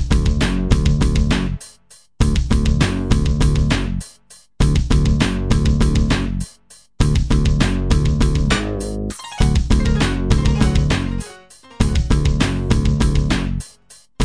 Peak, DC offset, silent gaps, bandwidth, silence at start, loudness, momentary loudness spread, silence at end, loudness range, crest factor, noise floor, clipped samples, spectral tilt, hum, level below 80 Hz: 0 dBFS; 0.2%; none; 11 kHz; 0 s; -18 LUFS; 9 LU; 0 s; 1 LU; 16 dB; -49 dBFS; under 0.1%; -6 dB/octave; none; -20 dBFS